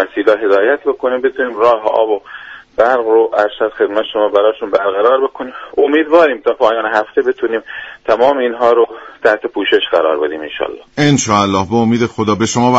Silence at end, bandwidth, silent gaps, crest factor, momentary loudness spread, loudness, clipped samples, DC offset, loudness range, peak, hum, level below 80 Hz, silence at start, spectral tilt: 0 s; 8 kHz; none; 14 dB; 9 LU; -13 LUFS; under 0.1%; under 0.1%; 1 LU; 0 dBFS; none; -50 dBFS; 0 s; -5 dB/octave